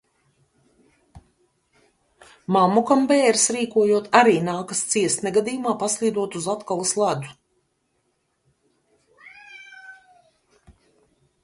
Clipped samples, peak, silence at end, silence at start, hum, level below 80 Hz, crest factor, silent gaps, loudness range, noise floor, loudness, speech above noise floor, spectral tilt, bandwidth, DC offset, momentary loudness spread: under 0.1%; -2 dBFS; 1.5 s; 1.15 s; none; -64 dBFS; 22 dB; none; 10 LU; -71 dBFS; -20 LUFS; 51 dB; -3.5 dB/octave; 11.5 kHz; under 0.1%; 24 LU